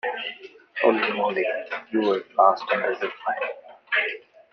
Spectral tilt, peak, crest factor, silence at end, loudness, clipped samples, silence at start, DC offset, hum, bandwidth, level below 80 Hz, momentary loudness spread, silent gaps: -6 dB/octave; -4 dBFS; 22 dB; 0.35 s; -24 LUFS; under 0.1%; 0.05 s; under 0.1%; none; 6.4 kHz; -76 dBFS; 14 LU; none